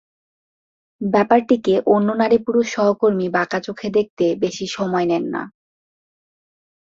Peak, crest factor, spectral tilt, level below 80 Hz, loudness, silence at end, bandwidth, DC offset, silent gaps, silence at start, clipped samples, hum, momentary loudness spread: -2 dBFS; 18 dB; -6 dB/octave; -60 dBFS; -19 LUFS; 1.35 s; 7.8 kHz; under 0.1%; 4.10-4.17 s; 1 s; under 0.1%; none; 9 LU